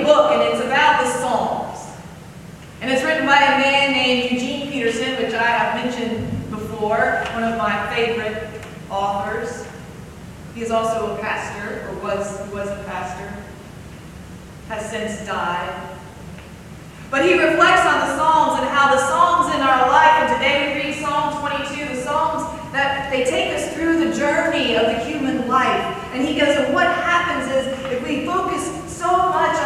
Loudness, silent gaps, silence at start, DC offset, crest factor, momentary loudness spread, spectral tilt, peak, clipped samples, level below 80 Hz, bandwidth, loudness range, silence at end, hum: -19 LUFS; none; 0 s; under 0.1%; 20 dB; 22 LU; -4 dB/octave; 0 dBFS; under 0.1%; -46 dBFS; 15.5 kHz; 12 LU; 0 s; none